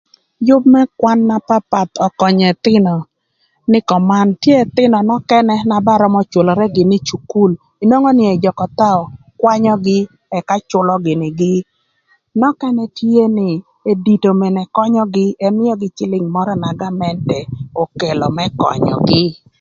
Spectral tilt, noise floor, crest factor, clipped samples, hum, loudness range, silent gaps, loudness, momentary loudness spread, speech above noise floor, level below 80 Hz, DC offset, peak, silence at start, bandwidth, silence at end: -7 dB/octave; -63 dBFS; 14 dB; under 0.1%; none; 4 LU; none; -14 LUFS; 8 LU; 50 dB; -50 dBFS; under 0.1%; 0 dBFS; 0.4 s; 7.4 kHz; 0.25 s